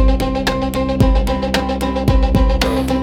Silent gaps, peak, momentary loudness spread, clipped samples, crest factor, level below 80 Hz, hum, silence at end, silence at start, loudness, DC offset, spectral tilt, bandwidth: none; -2 dBFS; 3 LU; under 0.1%; 14 dB; -18 dBFS; none; 0 s; 0 s; -17 LUFS; under 0.1%; -6 dB/octave; 16 kHz